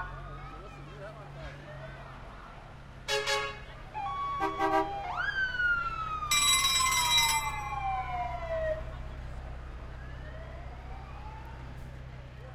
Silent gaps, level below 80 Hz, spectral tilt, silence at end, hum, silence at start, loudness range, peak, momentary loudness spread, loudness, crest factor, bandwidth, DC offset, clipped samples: none; -46 dBFS; -1.5 dB/octave; 0 s; none; 0 s; 17 LU; -12 dBFS; 22 LU; -29 LUFS; 20 dB; 16.5 kHz; under 0.1%; under 0.1%